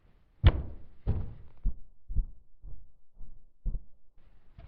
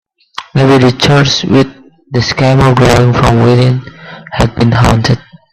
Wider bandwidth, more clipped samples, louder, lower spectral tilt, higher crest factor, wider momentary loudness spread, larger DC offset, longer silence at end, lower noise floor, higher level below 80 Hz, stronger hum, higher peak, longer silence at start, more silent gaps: second, 4.8 kHz vs 12.5 kHz; neither; second, -34 LUFS vs -9 LUFS; about the same, -6.5 dB/octave vs -6 dB/octave; first, 24 dB vs 10 dB; first, 27 LU vs 11 LU; second, under 0.1% vs 0.3%; second, 0 s vs 0.35 s; first, -51 dBFS vs -29 dBFS; second, -36 dBFS vs -28 dBFS; neither; second, -8 dBFS vs 0 dBFS; about the same, 0.45 s vs 0.4 s; neither